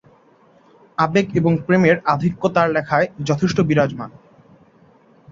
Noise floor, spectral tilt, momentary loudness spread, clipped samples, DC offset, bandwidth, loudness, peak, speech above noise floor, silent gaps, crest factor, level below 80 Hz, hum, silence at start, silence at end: -53 dBFS; -7 dB/octave; 7 LU; under 0.1%; under 0.1%; 7.4 kHz; -18 LUFS; -2 dBFS; 35 dB; none; 18 dB; -52 dBFS; none; 1 s; 1.25 s